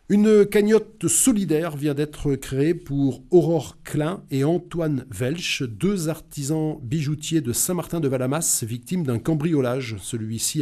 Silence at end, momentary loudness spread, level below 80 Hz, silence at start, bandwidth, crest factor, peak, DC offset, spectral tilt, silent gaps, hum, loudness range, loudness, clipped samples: 0 s; 9 LU; -48 dBFS; 0.1 s; 15.5 kHz; 16 dB; -6 dBFS; under 0.1%; -5 dB/octave; none; none; 4 LU; -22 LUFS; under 0.1%